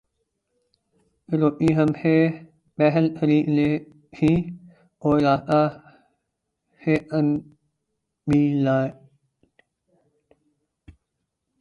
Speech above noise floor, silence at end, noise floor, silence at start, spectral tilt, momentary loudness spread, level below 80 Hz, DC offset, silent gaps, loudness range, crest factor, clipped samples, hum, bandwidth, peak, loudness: 59 dB; 2.7 s; -79 dBFS; 1.3 s; -9 dB/octave; 11 LU; -54 dBFS; under 0.1%; none; 5 LU; 18 dB; under 0.1%; none; 7.6 kHz; -6 dBFS; -22 LUFS